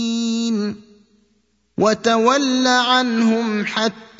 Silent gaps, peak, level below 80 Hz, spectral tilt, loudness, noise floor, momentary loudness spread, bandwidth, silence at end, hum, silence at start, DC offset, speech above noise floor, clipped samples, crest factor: none; -2 dBFS; -62 dBFS; -3.5 dB/octave; -18 LUFS; -64 dBFS; 8 LU; 7.8 kHz; 0.15 s; none; 0 s; under 0.1%; 47 dB; under 0.1%; 18 dB